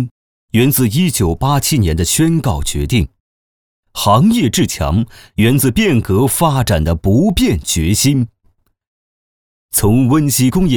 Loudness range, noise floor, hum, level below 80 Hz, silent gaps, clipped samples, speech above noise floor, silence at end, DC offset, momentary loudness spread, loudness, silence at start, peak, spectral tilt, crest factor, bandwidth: 2 LU; -57 dBFS; none; -28 dBFS; 0.11-0.48 s, 3.20-3.83 s, 8.87-9.69 s; under 0.1%; 45 dB; 0 s; 0.5%; 6 LU; -14 LUFS; 0 s; 0 dBFS; -5 dB/octave; 14 dB; over 20 kHz